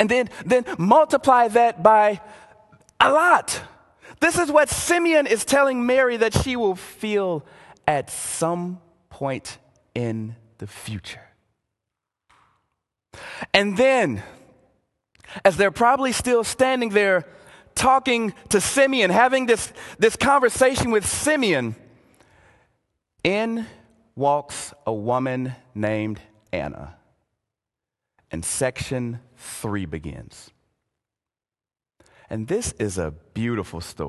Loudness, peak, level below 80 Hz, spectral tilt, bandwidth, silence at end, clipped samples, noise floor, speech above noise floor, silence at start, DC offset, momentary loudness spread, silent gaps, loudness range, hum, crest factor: -21 LUFS; 0 dBFS; -48 dBFS; -4 dB/octave; 12.5 kHz; 0 s; under 0.1%; under -90 dBFS; over 69 dB; 0 s; under 0.1%; 17 LU; none; 13 LU; none; 22 dB